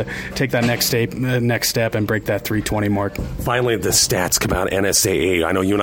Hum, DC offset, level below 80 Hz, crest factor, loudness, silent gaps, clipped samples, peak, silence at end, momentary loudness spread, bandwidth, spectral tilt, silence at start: none; under 0.1%; -36 dBFS; 16 dB; -18 LUFS; none; under 0.1%; -2 dBFS; 0 s; 6 LU; 17 kHz; -3.5 dB/octave; 0 s